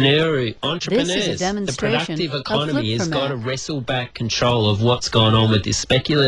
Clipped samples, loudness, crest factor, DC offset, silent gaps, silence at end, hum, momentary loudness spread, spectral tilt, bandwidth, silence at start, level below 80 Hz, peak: under 0.1%; -19 LUFS; 16 dB; under 0.1%; none; 0 s; none; 8 LU; -4.5 dB/octave; 11 kHz; 0 s; -44 dBFS; -2 dBFS